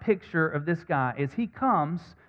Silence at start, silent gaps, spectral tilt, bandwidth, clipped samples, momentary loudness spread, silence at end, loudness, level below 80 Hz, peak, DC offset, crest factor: 0 s; none; -9 dB/octave; 6.8 kHz; under 0.1%; 5 LU; 0.2 s; -28 LUFS; -62 dBFS; -12 dBFS; under 0.1%; 16 dB